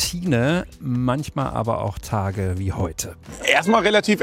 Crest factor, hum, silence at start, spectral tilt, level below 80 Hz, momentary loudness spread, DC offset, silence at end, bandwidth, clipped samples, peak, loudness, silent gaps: 18 dB; none; 0 s; -5 dB/octave; -42 dBFS; 9 LU; under 0.1%; 0 s; 16.5 kHz; under 0.1%; -4 dBFS; -21 LUFS; none